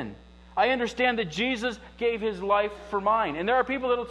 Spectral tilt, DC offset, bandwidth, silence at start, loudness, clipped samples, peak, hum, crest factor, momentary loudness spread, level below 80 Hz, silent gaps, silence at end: -4.5 dB/octave; under 0.1%; 11 kHz; 0 s; -26 LUFS; under 0.1%; -8 dBFS; 60 Hz at -50 dBFS; 18 dB; 5 LU; -52 dBFS; none; 0 s